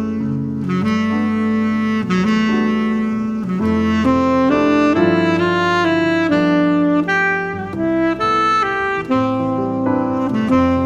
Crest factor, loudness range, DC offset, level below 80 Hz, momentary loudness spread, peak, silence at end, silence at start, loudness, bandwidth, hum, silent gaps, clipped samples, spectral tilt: 14 dB; 3 LU; under 0.1%; -44 dBFS; 5 LU; -2 dBFS; 0 s; 0 s; -16 LUFS; 8.8 kHz; none; none; under 0.1%; -7 dB/octave